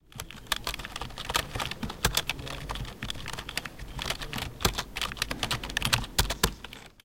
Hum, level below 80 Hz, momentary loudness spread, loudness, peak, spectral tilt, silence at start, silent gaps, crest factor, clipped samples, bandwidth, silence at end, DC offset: none; -42 dBFS; 10 LU; -31 LUFS; -4 dBFS; -2.5 dB/octave; 0 s; none; 30 dB; under 0.1%; 17 kHz; 0 s; 0.2%